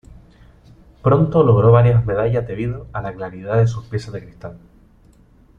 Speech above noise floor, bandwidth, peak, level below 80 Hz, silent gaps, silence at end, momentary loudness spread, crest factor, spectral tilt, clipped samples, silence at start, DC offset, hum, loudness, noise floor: 34 dB; 6.8 kHz; -2 dBFS; -42 dBFS; none; 1 s; 21 LU; 16 dB; -9.5 dB/octave; under 0.1%; 1.05 s; under 0.1%; none; -17 LUFS; -50 dBFS